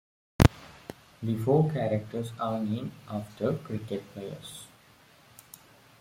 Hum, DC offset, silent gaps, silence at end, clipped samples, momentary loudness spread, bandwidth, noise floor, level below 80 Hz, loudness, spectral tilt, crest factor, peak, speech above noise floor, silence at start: none; under 0.1%; none; 1.35 s; under 0.1%; 23 LU; 16.5 kHz; -58 dBFS; -44 dBFS; -30 LUFS; -7 dB/octave; 28 dB; -2 dBFS; 28 dB; 0.4 s